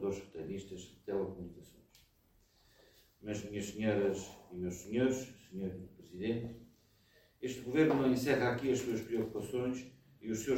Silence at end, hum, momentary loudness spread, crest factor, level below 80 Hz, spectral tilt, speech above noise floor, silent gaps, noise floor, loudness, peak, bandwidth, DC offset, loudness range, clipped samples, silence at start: 0 s; none; 18 LU; 20 dB; -64 dBFS; -6 dB/octave; 35 dB; none; -70 dBFS; -37 LUFS; -18 dBFS; 16.5 kHz; under 0.1%; 10 LU; under 0.1%; 0 s